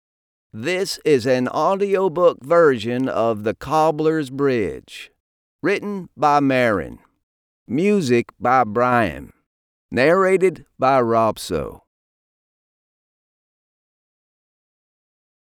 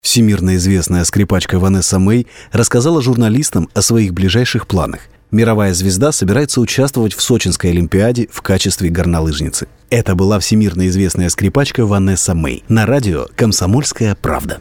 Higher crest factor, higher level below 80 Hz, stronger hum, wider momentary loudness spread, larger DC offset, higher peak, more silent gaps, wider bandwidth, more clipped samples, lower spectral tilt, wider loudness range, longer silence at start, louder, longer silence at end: first, 18 dB vs 12 dB; second, -52 dBFS vs -32 dBFS; neither; first, 11 LU vs 5 LU; neither; about the same, -4 dBFS vs -2 dBFS; first, 5.20-5.59 s, 7.23-7.66 s, 9.46-9.89 s vs none; about the same, 18 kHz vs 18 kHz; neither; about the same, -6 dB/octave vs -5 dB/octave; about the same, 4 LU vs 2 LU; first, 0.55 s vs 0.05 s; second, -19 LUFS vs -13 LUFS; first, 3.7 s vs 0 s